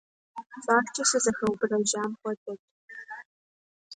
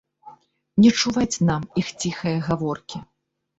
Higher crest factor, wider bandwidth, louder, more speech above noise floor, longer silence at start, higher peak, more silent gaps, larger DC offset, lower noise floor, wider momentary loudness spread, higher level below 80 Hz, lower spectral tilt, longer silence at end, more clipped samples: about the same, 22 dB vs 18 dB; first, 11 kHz vs 8 kHz; second, -27 LUFS vs -22 LUFS; first, over 63 dB vs 27 dB; about the same, 0.35 s vs 0.25 s; second, -8 dBFS vs -4 dBFS; first, 2.37-2.46 s, 2.59-2.88 s, 3.25-3.91 s vs none; neither; first, under -90 dBFS vs -48 dBFS; first, 21 LU vs 14 LU; second, -68 dBFS vs -52 dBFS; second, -2.5 dB/octave vs -5 dB/octave; second, 0 s vs 0.55 s; neither